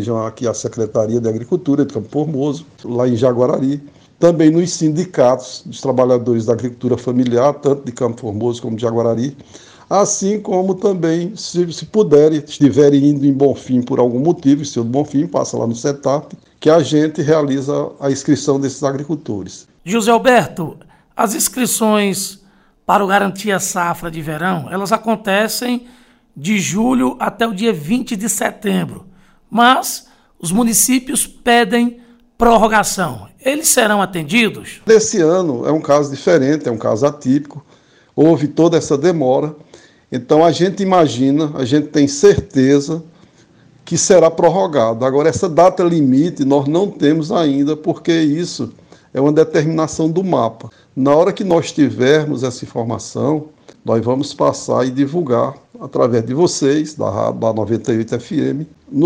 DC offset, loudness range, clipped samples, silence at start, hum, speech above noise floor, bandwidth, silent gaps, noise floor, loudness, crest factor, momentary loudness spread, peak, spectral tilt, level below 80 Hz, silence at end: under 0.1%; 4 LU; under 0.1%; 0 s; none; 35 dB; 16 kHz; none; -50 dBFS; -15 LUFS; 14 dB; 10 LU; 0 dBFS; -5 dB/octave; -46 dBFS; 0 s